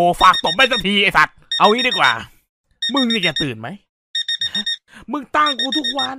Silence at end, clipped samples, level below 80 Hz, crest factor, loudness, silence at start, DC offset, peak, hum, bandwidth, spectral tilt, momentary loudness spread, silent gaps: 0 s; under 0.1%; -46 dBFS; 18 dB; -16 LUFS; 0 s; under 0.1%; 0 dBFS; none; 16 kHz; -3.5 dB/octave; 12 LU; 2.49-2.64 s, 3.89-4.14 s